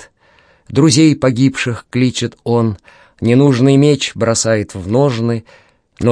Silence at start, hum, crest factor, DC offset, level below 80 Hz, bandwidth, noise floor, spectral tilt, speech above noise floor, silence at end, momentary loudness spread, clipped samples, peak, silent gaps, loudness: 0 s; none; 14 dB; under 0.1%; -48 dBFS; 10.5 kHz; -51 dBFS; -5.5 dB/octave; 38 dB; 0 s; 10 LU; under 0.1%; 0 dBFS; none; -14 LUFS